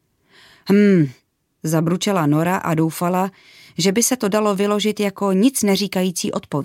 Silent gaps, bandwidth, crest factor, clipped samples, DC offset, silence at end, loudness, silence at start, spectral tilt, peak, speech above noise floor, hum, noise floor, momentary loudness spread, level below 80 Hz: none; 17 kHz; 14 dB; under 0.1%; under 0.1%; 0 s; -18 LUFS; 0.65 s; -5 dB/octave; -4 dBFS; 34 dB; none; -52 dBFS; 8 LU; -62 dBFS